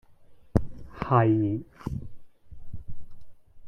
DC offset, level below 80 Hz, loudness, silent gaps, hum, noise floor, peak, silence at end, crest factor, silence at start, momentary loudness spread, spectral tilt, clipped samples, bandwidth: under 0.1%; -44 dBFS; -27 LUFS; none; none; -50 dBFS; -4 dBFS; 0 s; 24 dB; 0.1 s; 24 LU; -10 dB/octave; under 0.1%; 9 kHz